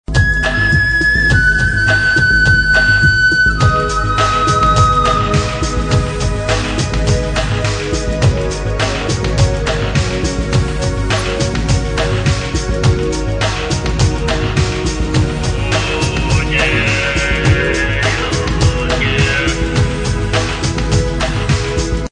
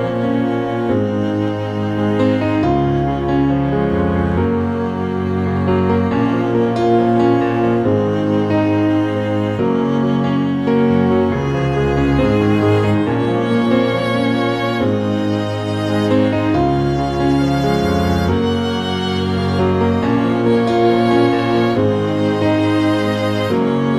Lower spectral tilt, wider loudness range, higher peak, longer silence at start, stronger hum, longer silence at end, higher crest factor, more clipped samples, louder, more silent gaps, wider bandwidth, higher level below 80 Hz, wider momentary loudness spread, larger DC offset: second, -4.5 dB/octave vs -7.5 dB/octave; first, 5 LU vs 2 LU; about the same, 0 dBFS vs -2 dBFS; about the same, 0.1 s vs 0 s; neither; about the same, 0.05 s vs 0 s; about the same, 14 dB vs 14 dB; neither; about the same, -14 LUFS vs -16 LUFS; neither; second, 10.5 kHz vs 13 kHz; first, -22 dBFS vs -36 dBFS; first, 7 LU vs 4 LU; second, under 0.1% vs 0.3%